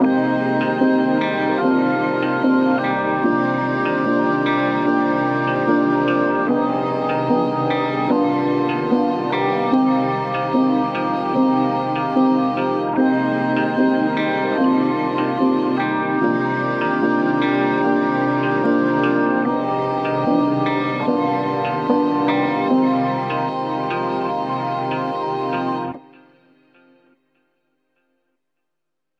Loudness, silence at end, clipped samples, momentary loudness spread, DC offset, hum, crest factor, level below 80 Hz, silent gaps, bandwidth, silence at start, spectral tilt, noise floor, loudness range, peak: -19 LUFS; 3.2 s; under 0.1%; 5 LU; under 0.1%; none; 16 dB; -66 dBFS; none; 6.6 kHz; 0 s; -8 dB/octave; -82 dBFS; 5 LU; -4 dBFS